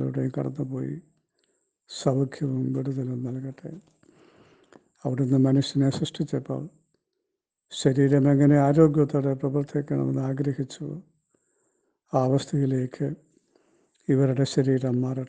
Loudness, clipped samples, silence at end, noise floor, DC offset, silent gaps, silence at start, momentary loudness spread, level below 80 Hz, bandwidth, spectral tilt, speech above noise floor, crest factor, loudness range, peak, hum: -25 LUFS; under 0.1%; 0 s; -83 dBFS; under 0.1%; none; 0 s; 17 LU; -60 dBFS; 9.4 kHz; -7.5 dB/octave; 59 dB; 20 dB; 8 LU; -6 dBFS; none